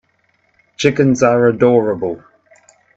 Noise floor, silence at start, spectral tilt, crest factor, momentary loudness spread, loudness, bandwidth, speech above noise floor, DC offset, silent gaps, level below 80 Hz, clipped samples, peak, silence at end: -61 dBFS; 0.8 s; -6 dB/octave; 16 dB; 11 LU; -14 LUFS; 8 kHz; 48 dB; under 0.1%; none; -54 dBFS; under 0.1%; 0 dBFS; 0.8 s